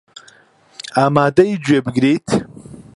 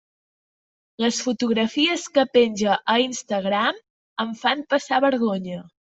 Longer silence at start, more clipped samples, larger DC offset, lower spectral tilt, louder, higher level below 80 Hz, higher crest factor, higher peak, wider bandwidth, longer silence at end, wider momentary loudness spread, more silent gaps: second, 0.85 s vs 1 s; neither; neither; first, -6.5 dB/octave vs -3.5 dB/octave; first, -16 LUFS vs -22 LUFS; first, -52 dBFS vs -66 dBFS; about the same, 18 dB vs 18 dB; first, 0 dBFS vs -4 dBFS; first, 11.5 kHz vs 8.2 kHz; about the same, 0.15 s vs 0.25 s; about the same, 10 LU vs 10 LU; second, none vs 3.90-4.16 s